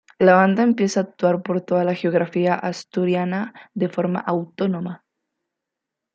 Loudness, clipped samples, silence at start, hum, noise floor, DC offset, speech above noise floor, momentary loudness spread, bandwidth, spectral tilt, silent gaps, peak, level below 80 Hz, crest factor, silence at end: -21 LUFS; under 0.1%; 0.2 s; none; -84 dBFS; under 0.1%; 64 dB; 11 LU; 7.8 kHz; -7 dB/octave; none; -2 dBFS; -68 dBFS; 20 dB; 1.2 s